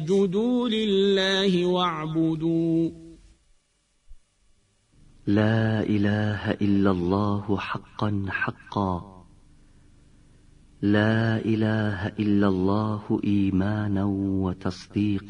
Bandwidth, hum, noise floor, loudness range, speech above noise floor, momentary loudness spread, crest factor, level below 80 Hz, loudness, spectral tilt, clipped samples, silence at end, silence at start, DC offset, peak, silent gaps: 9.8 kHz; none; -68 dBFS; 6 LU; 44 dB; 7 LU; 18 dB; -54 dBFS; -25 LUFS; -7 dB/octave; under 0.1%; 0 s; 0 s; under 0.1%; -6 dBFS; none